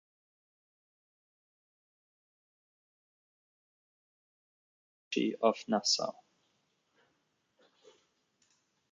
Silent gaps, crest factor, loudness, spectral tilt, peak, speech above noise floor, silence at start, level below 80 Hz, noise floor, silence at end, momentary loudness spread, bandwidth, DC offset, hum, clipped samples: none; 28 dB; -32 LUFS; -2.5 dB/octave; -14 dBFS; 46 dB; 5.1 s; -88 dBFS; -78 dBFS; 2.8 s; 8 LU; 7.4 kHz; under 0.1%; none; under 0.1%